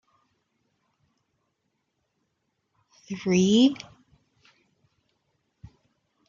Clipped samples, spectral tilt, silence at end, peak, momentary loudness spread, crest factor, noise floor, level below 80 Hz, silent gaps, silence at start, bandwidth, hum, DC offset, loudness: under 0.1%; -5.5 dB/octave; 2.55 s; -8 dBFS; 21 LU; 22 dB; -77 dBFS; -68 dBFS; none; 3.1 s; 7.4 kHz; none; under 0.1%; -22 LUFS